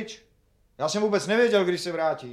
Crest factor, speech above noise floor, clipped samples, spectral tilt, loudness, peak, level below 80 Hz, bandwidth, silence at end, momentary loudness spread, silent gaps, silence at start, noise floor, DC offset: 16 dB; 40 dB; under 0.1%; -4 dB/octave; -24 LUFS; -10 dBFS; -66 dBFS; 13.5 kHz; 0 s; 13 LU; none; 0 s; -64 dBFS; under 0.1%